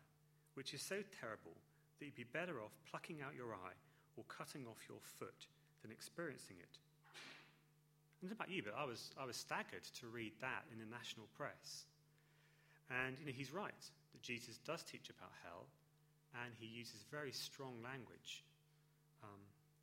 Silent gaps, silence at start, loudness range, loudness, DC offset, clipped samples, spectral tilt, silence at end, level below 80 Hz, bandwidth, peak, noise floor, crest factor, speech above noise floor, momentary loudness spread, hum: none; 0 s; 6 LU; -51 LUFS; under 0.1%; under 0.1%; -3.5 dB/octave; 0 s; -88 dBFS; 16 kHz; -28 dBFS; -75 dBFS; 26 dB; 23 dB; 15 LU; none